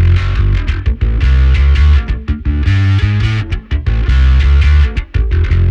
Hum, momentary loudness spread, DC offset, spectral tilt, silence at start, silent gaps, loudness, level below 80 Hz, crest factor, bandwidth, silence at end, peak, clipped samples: none; 7 LU; under 0.1%; -7.5 dB/octave; 0 s; none; -13 LUFS; -12 dBFS; 10 dB; 6.4 kHz; 0 s; 0 dBFS; under 0.1%